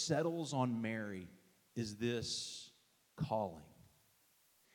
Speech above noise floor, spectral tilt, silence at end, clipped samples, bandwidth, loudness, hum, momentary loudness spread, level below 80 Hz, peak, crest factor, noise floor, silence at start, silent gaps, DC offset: 33 dB; -5 dB/octave; 0.9 s; under 0.1%; 17.5 kHz; -41 LUFS; none; 14 LU; -74 dBFS; -22 dBFS; 20 dB; -73 dBFS; 0 s; none; under 0.1%